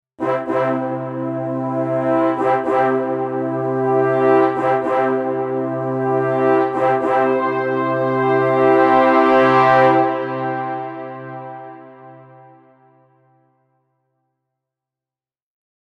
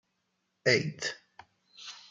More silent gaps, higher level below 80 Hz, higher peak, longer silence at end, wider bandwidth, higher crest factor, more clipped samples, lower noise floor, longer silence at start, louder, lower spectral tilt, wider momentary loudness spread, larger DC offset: neither; first, -62 dBFS vs -76 dBFS; first, -2 dBFS vs -10 dBFS; first, 3.6 s vs 0.1 s; second, 7 kHz vs 9.6 kHz; second, 16 dB vs 24 dB; neither; first, under -90 dBFS vs -79 dBFS; second, 0.2 s vs 0.65 s; first, -17 LUFS vs -30 LUFS; first, -8 dB/octave vs -3.5 dB/octave; second, 12 LU vs 20 LU; neither